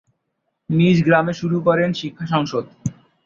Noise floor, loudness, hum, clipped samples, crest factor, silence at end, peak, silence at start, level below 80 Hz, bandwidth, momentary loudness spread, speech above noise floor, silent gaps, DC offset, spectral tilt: -74 dBFS; -19 LUFS; none; under 0.1%; 18 dB; 0.35 s; -2 dBFS; 0.7 s; -54 dBFS; 7.4 kHz; 13 LU; 56 dB; none; under 0.1%; -7 dB/octave